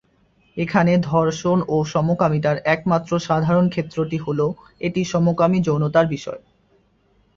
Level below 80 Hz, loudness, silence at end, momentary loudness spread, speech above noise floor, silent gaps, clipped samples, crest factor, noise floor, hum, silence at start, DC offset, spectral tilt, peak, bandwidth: -52 dBFS; -20 LUFS; 1 s; 8 LU; 41 dB; none; under 0.1%; 18 dB; -60 dBFS; none; 0.55 s; under 0.1%; -7 dB/octave; -2 dBFS; 7.4 kHz